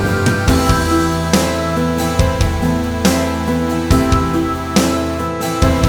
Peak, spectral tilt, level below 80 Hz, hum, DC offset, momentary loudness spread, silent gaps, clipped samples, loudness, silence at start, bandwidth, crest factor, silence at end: 0 dBFS; -5.5 dB/octave; -24 dBFS; none; under 0.1%; 4 LU; none; under 0.1%; -16 LUFS; 0 s; over 20 kHz; 14 dB; 0 s